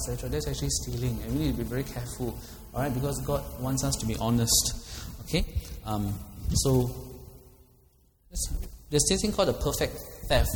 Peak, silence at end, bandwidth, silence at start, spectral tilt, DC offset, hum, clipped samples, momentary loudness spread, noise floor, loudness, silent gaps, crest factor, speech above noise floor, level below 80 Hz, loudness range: -8 dBFS; 0 s; over 20 kHz; 0 s; -4 dB/octave; under 0.1%; none; under 0.1%; 14 LU; -62 dBFS; -29 LUFS; none; 20 dB; 34 dB; -38 dBFS; 3 LU